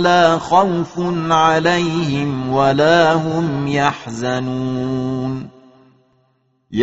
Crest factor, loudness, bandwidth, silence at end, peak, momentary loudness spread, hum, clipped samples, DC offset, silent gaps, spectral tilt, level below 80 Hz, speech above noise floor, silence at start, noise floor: 16 dB; -16 LUFS; 8 kHz; 0 s; 0 dBFS; 10 LU; none; under 0.1%; 0.3%; none; -4.5 dB/octave; -50 dBFS; 46 dB; 0 s; -62 dBFS